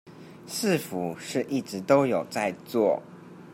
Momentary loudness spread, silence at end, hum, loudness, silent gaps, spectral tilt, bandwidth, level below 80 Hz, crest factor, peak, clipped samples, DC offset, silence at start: 13 LU; 0 s; none; -27 LUFS; none; -5 dB/octave; 16 kHz; -74 dBFS; 20 dB; -6 dBFS; under 0.1%; under 0.1%; 0.05 s